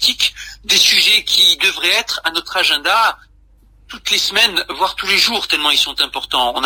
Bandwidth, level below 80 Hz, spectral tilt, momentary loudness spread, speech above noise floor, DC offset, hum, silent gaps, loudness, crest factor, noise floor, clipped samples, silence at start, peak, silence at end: 16 kHz; -48 dBFS; 0.5 dB/octave; 9 LU; 33 dB; under 0.1%; none; none; -13 LUFS; 16 dB; -48 dBFS; under 0.1%; 0 s; 0 dBFS; 0 s